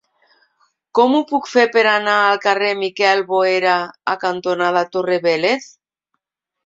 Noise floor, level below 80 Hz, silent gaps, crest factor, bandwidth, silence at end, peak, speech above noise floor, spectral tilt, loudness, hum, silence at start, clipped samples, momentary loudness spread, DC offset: -80 dBFS; -68 dBFS; none; 16 dB; 7.8 kHz; 1 s; -2 dBFS; 64 dB; -4 dB/octave; -16 LUFS; none; 0.95 s; under 0.1%; 6 LU; under 0.1%